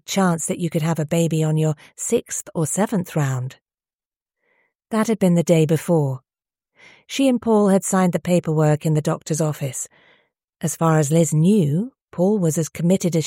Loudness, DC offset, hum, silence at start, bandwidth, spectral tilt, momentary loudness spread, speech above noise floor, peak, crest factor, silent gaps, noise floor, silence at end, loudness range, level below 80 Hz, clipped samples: -20 LUFS; under 0.1%; none; 0.1 s; 16.5 kHz; -6 dB/octave; 10 LU; over 71 dB; -4 dBFS; 16 dB; 3.62-3.66 s, 3.95-3.99 s, 4.75-4.79 s, 10.44-10.48 s, 12.02-12.08 s; under -90 dBFS; 0 s; 4 LU; -60 dBFS; under 0.1%